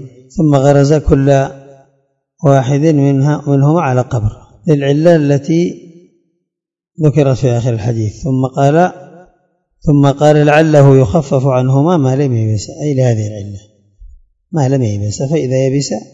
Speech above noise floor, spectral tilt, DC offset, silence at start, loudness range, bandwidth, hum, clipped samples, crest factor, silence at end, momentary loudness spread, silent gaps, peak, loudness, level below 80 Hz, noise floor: 70 dB; -7.5 dB/octave; under 0.1%; 0 s; 5 LU; 7.8 kHz; none; 0.5%; 12 dB; 0.1 s; 9 LU; none; 0 dBFS; -12 LUFS; -36 dBFS; -81 dBFS